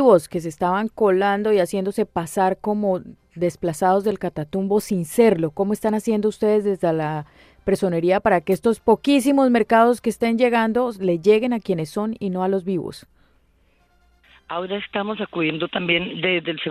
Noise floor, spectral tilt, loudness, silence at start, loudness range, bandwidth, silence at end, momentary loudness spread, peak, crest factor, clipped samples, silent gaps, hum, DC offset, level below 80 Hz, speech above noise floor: -60 dBFS; -6 dB/octave; -21 LUFS; 0 s; 9 LU; 15.5 kHz; 0 s; 9 LU; -2 dBFS; 18 dB; under 0.1%; none; none; under 0.1%; -54 dBFS; 40 dB